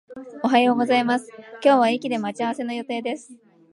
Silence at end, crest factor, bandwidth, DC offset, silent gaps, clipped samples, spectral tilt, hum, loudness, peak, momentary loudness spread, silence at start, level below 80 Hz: 0.4 s; 18 dB; 11.5 kHz; under 0.1%; none; under 0.1%; -4.5 dB/octave; none; -22 LUFS; -4 dBFS; 13 LU; 0.1 s; -74 dBFS